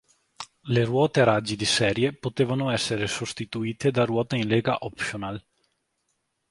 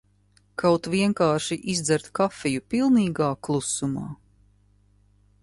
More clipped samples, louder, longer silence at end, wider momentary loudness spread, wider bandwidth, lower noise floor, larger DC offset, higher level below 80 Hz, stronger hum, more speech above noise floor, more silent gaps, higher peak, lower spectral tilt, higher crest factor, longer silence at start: neither; about the same, -25 LUFS vs -24 LUFS; second, 1.1 s vs 1.25 s; first, 12 LU vs 9 LU; about the same, 11.5 kHz vs 11.5 kHz; first, -75 dBFS vs -62 dBFS; neither; about the same, -56 dBFS vs -58 dBFS; second, none vs 50 Hz at -50 dBFS; first, 51 dB vs 38 dB; neither; about the same, -6 dBFS vs -8 dBFS; about the same, -5 dB/octave vs -5 dB/octave; about the same, 20 dB vs 18 dB; second, 0.4 s vs 0.6 s